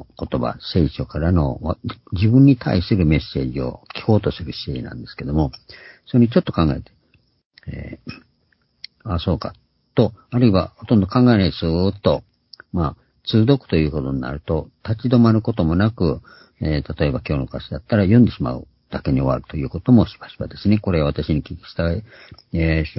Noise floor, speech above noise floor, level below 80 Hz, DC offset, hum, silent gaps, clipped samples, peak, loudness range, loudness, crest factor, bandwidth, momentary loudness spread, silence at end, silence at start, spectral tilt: -64 dBFS; 45 dB; -34 dBFS; under 0.1%; none; 7.46-7.50 s; under 0.1%; -2 dBFS; 5 LU; -20 LUFS; 18 dB; 5.8 kHz; 16 LU; 0.05 s; 0 s; -12 dB/octave